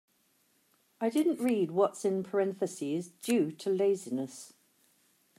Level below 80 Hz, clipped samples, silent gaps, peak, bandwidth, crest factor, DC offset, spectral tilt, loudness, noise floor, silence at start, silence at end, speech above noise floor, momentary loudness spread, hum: -84 dBFS; under 0.1%; none; -14 dBFS; 15.5 kHz; 18 dB; under 0.1%; -5.5 dB/octave; -31 LUFS; -71 dBFS; 1 s; 0.9 s; 41 dB; 8 LU; none